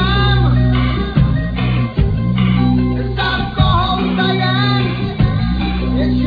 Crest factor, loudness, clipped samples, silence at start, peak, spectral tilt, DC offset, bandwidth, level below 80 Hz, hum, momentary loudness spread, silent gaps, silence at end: 14 dB; -15 LUFS; under 0.1%; 0 s; 0 dBFS; -9 dB/octave; under 0.1%; 5 kHz; -22 dBFS; none; 4 LU; none; 0 s